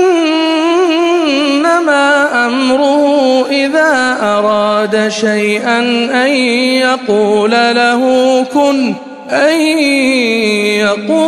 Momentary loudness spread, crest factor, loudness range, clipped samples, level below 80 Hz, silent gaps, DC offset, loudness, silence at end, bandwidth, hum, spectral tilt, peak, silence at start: 2 LU; 10 dB; 1 LU; under 0.1%; -58 dBFS; none; under 0.1%; -11 LUFS; 0 s; 14 kHz; none; -3.5 dB/octave; 0 dBFS; 0 s